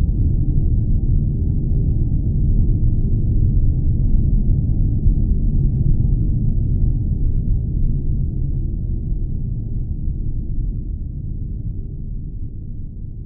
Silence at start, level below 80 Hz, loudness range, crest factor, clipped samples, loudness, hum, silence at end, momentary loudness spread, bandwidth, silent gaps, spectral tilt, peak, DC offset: 0 s; -18 dBFS; 8 LU; 14 dB; under 0.1%; -21 LUFS; none; 0 s; 10 LU; 0.8 kHz; none; -21.5 dB/octave; -2 dBFS; under 0.1%